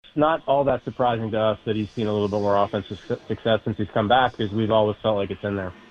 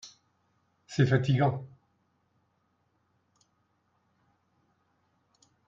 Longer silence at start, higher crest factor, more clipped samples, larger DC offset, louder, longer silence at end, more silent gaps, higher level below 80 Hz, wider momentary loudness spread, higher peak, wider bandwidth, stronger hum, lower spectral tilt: about the same, 0.15 s vs 0.05 s; second, 18 dB vs 24 dB; neither; neither; first, -23 LUFS vs -27 LUFS; second, 0.2 s vs 4 s; neither; first, -52 dBFS vs -66 dBFS; second, 8 LU vs 13 LU; first, -6 dBFS vs -10 dBFS; about the same, 7.2 kHz vs 7.6 kHz; neither; about the same, -7.5 dB/octave vs -7 dB/octave